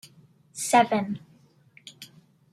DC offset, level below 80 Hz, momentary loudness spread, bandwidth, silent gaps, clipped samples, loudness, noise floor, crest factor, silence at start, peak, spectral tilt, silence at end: under 0.1%; -74 dBFS; 26 LU; 14.5 kHz; none; under 0.1%; -24 LUFS; -58 dBFS; 24 dB; 0.55 s; -4 dBFS; -3.5 dB/octave; 0.5 s